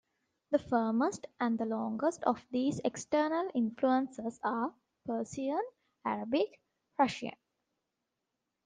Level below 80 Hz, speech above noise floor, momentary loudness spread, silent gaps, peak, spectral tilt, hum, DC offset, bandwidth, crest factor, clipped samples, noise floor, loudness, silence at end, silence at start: -74 dBFS; 54 dB; 9 LU; none; -14 dBFS; -5 dB/octave; none; under 0.1%; 9.8 kHz; 20 dB; under 0.1%; -86 dBFS; -34 LUFS; 1.3 s; 0.5 s